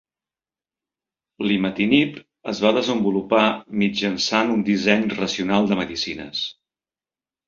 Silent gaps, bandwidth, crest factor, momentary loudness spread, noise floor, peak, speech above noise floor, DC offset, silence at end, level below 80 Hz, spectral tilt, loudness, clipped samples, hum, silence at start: none; 7.4 kHz; 20 dB; 9 LU; under -90 dBFS; -2 dBFS; over 69 dB; under 0.1%; 0.95 s; -58 dBFS; -5 dB/octave; -21 LUFS; under 0.1%; none; 1.4 s